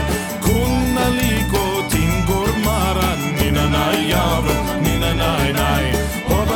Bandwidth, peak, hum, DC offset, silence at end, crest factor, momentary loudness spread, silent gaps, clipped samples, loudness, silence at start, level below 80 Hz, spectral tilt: over 20 kHz; -2 dBFS; none; under 0.1%; 0 s; 14 dB; 2 LU; none; under 0.1%; -18 LUFS; 0 s; -26 dBFS; -5 dB/octave